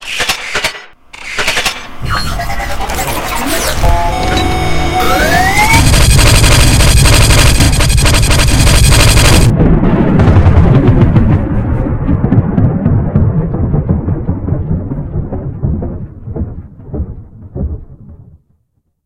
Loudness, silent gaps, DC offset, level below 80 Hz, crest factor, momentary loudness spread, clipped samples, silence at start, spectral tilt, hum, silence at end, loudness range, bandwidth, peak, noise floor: -10 LUFS; none; under 0.1%; -14 dBFS; 10 dB; 15 LU; 1%; 0 s; -4.5 dB/octave; none; 0.9 s; 12 LU; 17.5 kHz; 0 dBFS; -60 dBFS